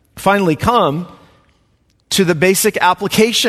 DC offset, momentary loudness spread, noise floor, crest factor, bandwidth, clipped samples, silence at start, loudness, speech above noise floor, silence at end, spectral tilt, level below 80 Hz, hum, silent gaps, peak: under 0.1%; 6 LU; -58 dBFS; 16 dB; 14.5 kHz; under 0.1%; 0.15 s; -14 LUFS; 44 dB; 0 s; -4 dB/octave; -44 dBFS; none; none; 0 dBFS